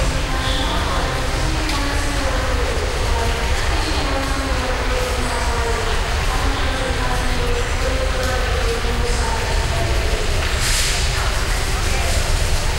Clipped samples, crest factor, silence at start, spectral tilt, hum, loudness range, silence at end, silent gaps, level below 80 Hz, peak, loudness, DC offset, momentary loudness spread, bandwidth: under 0.1%; 14 dB; 0 s; -3.5 dB/octave; none; 1 LU; 0 s; none; -20 dBFS; -6 dBFS; -20 LUFS; under 0.1%; 2 LU; 16 kHz